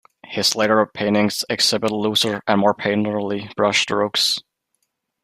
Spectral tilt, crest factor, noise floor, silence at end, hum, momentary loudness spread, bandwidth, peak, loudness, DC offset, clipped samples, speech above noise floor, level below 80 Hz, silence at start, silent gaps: -3.5 dB/octave; 20 dB; -73 dBFS; 0.85 s; none; 5 LU; 15.5 kHz; 0 dBFS; -19 LUFS; under 0.1%; under 0.1%; 53 dB; -62 dBFS; 0.3 s; none